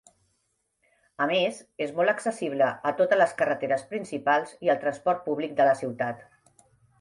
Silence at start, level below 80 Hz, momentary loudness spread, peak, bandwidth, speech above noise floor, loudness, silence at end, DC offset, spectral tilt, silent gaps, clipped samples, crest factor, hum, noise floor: 1.2 s; -74 dBFS; 9 LU; -8 dBFS; 11.5 kHz; 49 dB; -26 LUFS; 0.75 s; under 0.1%; -4.5 dB/octave; none; under 0.1%; 18 dB; none; -75 dBFS